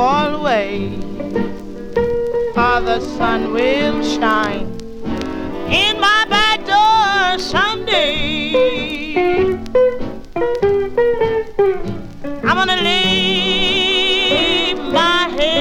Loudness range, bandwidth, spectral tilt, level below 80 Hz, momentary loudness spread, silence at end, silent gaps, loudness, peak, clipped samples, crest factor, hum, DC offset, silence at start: 4 LU; 16.5 kHz; -4 dB/octave; -34 dBFS; 11 LU; 0 s; none; -15 LUFS; 0 dBFS; under 0.1%; 16 dB; none; under 0.1%; 0 s